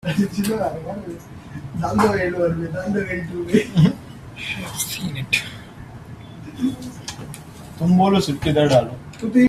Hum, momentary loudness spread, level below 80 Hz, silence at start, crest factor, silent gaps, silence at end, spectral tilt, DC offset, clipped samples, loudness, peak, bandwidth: none; 21 LU; -46 dBFS; 0.05 s; 18 dB; none; 0 s; -6 dB/octave; under 0.1%; under 0.1%; -21 LUFS; -2 dBFS; 15.5 kHz